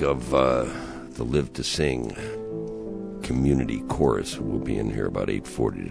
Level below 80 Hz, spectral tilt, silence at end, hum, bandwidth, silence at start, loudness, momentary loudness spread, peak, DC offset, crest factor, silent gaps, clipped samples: -40 dBFS; -6 dB/octave; 0 s; none; 11 kHz; 0 s; -26 LUFS; 11 LU; -6 dBFS; under 0.1%; 18 dB; none; under 0.1%